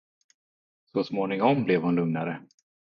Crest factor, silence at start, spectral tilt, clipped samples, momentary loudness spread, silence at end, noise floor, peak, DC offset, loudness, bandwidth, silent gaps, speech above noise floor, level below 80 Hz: 20 dB; 0.95 s; -8.5 dB/octave; under 0.1%; 10 LU; 0.45 s; under -90 dBFS; -8 dBFS; under 0.1%; -26 LUFS; 7 kHz; none; over 65 dB; -70 dBFS